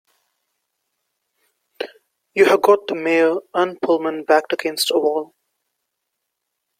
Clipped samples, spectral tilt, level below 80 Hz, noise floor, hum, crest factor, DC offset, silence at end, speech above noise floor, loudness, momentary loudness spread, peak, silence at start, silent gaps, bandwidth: under 0.1%; -3 dB/octave; -70 dBFS; -78 dBFS; none; 20 dB; under 0.1%; 1.55 s; 60 dB; -18 LUFS; 17 LU; -2 dBFS; 1.8 s; none; 16 kHz